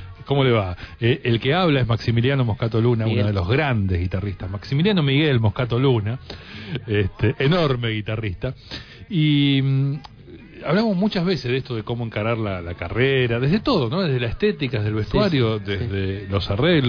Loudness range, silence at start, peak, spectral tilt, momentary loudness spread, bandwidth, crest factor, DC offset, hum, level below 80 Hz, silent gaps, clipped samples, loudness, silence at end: 3 LU; 0 s; -6 dBFS; -8.5 dB/octave; 10 LU; 5.4 kHz; 14 dB; under 0.1%; none; -42 dBFS; none; under 0.1%; -21 LUFS; 0 s